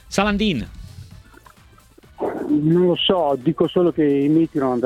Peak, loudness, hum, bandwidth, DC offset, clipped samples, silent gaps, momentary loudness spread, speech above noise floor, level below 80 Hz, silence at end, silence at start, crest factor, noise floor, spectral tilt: -4 dBFS; -19 LUFS; none; 13.5 kHz; under 0.1%; under 0.1%; none; 12 LU; 32 dB; -44 dBFS; 0 s; 0.1 s; 16 dB; -49 dBFS; -6 dB/octave